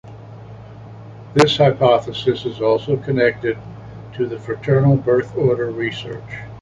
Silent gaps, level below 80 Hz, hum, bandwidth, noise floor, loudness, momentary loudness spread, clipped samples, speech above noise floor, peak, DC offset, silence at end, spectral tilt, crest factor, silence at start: none; -48 dBFS; none; 11 kHz; -37 dBFS; -18 LUFS; 23 LU; under 0.1%; 19 dB; 0 dBFS; under 0.1%; 0 s; -6.5 dB/octave; 18 dB; 0.05 s